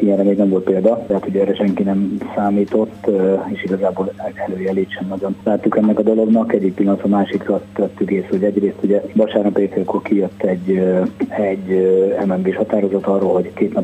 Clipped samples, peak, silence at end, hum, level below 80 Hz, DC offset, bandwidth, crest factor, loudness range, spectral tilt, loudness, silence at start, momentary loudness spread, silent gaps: under 0.1%; 0 dBFS; 0 s; none; -56 dBFS; under 0.1%; 8.4 kHz; 16 dB; 2 LU; -9 dB/octave; -17 LUFS; 0 s; 6 LU; none